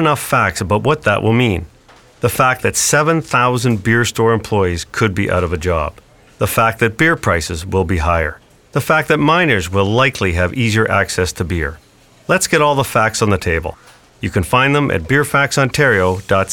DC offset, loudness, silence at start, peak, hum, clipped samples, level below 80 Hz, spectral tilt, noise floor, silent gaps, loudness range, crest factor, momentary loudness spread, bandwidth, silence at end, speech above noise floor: 0.3%; -15 LUFS; 0 s; -2 dBFS; none; under 0.1%; -34 dBFS; -4.5 dB/octave; -45 dBFS; none; 2 LU; 14 dB; 7 LU; 19.5 kHz; 0 s; 30 dB